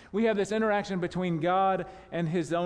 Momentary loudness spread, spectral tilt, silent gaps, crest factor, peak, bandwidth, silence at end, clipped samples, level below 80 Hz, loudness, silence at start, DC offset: 7 LU; -6.5 dB/octave; none; 12 dB; -16 dBFS; 11 kHz; 0 s; under 0.1%; -58 dBFS; -28 LUFS; 0 s; under 0.1%